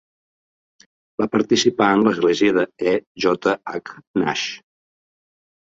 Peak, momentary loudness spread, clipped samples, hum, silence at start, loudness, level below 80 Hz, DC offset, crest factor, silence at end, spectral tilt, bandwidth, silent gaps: -2 dBFS; 13 LU; under 0.1%; none; 1.2 s; -19 LUFS; -60 dBFS; under 0.1%; 20 dB; 1.2 s; -4.5 dB/octave; 7.8 kHz; 3.07-3.15 s, 4.07-4.14 s